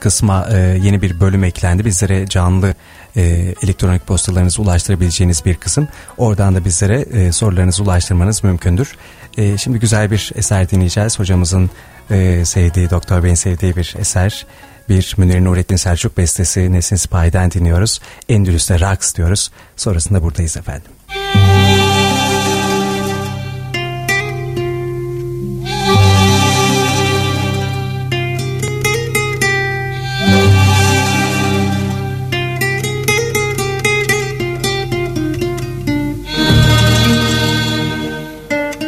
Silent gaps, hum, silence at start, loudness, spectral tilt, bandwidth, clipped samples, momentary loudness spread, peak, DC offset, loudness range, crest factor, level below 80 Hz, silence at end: none; none; 0 s; -14 LUFS; -4.5 dB/octave; 15.5 kHz; under 0.1%; 9 LU; 0 dBFS; under 0.1%; 2 LU; 14 dB; -28 dBFS; 0 s